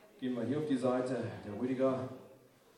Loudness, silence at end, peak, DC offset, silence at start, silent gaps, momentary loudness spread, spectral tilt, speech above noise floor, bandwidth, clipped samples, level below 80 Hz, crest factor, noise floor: -36 LUFS; 0.4 s; -20 dBFS; under 0.1%; 0.15 s; none; 9 LU; -7.5 dB/octave; 27 dB; 11 kHz; under 0.1%; -76 dBFS; 16 dB; -61 dBFS